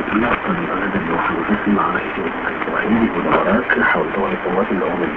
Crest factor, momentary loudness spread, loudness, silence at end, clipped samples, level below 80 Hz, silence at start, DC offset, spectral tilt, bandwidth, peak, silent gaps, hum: 16 dB; 5 LU; -18 LUFS; 0 s; under 0.1%; -42 dBFS; 0 s; under 0.1%; -8.5 dB/octave; 4.8 kHz; -2 dBFS; none; none